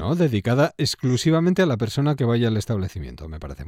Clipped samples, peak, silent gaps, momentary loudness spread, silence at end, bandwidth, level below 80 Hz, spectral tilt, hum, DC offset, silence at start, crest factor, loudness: under 0.1%; -8 dBFS; none; 15 LU; 0 s; 16 kHz; -44 dBFS; -6.5 dB/octave; none; under 0.1%; 0 s; 14 dB; -21 LUFS